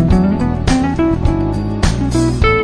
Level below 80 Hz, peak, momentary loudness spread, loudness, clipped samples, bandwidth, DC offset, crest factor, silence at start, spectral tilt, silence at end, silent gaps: -20 dBFS; 0 dBFS; 4 LU; -15 LUFS; under 0.1%; 11 kHz; under 0.1%; 12 dB; 0 s; -6.5 dB/octave; 0 s; none